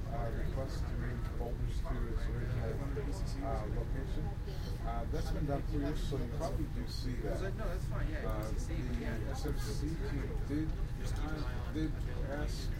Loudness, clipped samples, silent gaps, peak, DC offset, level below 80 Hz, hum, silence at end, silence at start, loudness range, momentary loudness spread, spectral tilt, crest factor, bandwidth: -39 LUFS; under 0.1%; none; -22 dBFS; under 0.1%; -38 dBFS; none; 0 s; 0 s; 1 LU; 2 LU; -6.5 dB/octave; 14 dB; 16 kHz